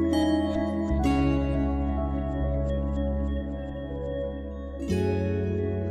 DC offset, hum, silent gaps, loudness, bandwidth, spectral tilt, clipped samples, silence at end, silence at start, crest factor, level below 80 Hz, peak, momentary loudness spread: under 0.1%; none; none; -28 LUFS; 12 kHz; -8 dB/octave; under 0.1%; 0 s; 0 s; 14 dB; -32 dBFS; -12 dBFS; 10 LU